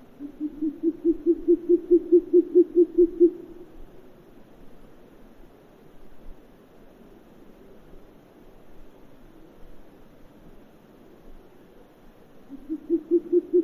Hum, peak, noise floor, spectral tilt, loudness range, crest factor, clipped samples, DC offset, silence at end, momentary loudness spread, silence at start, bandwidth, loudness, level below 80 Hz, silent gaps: none; -8 dBFS; -51 dBFS; -9.5 dB/octave; 11 LU; 18 dB; under 0.1%; under 0.1%; 0 s; 23 LU; 0.2 s; 2.9 kHz; -22 LUFS; -54 dBFS; none